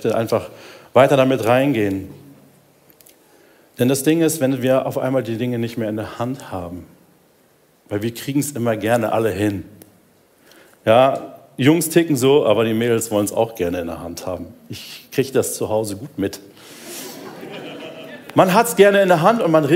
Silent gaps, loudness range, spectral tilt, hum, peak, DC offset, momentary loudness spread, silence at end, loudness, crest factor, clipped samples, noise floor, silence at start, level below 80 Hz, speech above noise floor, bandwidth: none; 8 LU; -5.5 dB/octave; none; 0 dBFS; under 0.1%; 19 LU; 0 s; -18 LUFS; 18 dB; under 0.1%; -56 dBFS; 0 s; -60 dBFS; 38 dB; 16 kHz